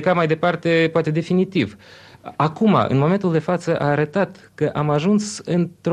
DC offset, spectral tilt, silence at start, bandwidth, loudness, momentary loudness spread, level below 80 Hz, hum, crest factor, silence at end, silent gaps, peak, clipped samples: under 0.1%; -6.5 dB/octave; 0 s; 10.5 kHz; -20 LUFS; 7 LU; -56 dBFS; none; 14 dB; 0 s; none; -4 dBFS; under 0.1%